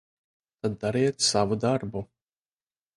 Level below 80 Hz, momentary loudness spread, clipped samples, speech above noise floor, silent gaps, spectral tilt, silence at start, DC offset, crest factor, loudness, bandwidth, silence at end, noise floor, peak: -58 dBFS; 14 LU; under 0.1%; over 64 dB; none; -4 dB/octave; 0.65 s; under 0.1%; 20 dB; -26 LUFS; 11.5 kHz; 0.9 s; under -90 dBFS; -10 dBFS